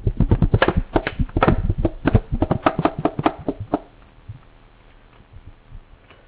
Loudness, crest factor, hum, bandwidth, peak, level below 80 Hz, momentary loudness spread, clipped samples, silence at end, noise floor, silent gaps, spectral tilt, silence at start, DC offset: -21 LUFS; 18 dB; none; 4 kHz; -4 dBFS; -28 dBFS; 9 LU; under 0.1%; 0.45 s; -49 dBFS; none; -11.5 dB/octave; 0 s; under 0.1%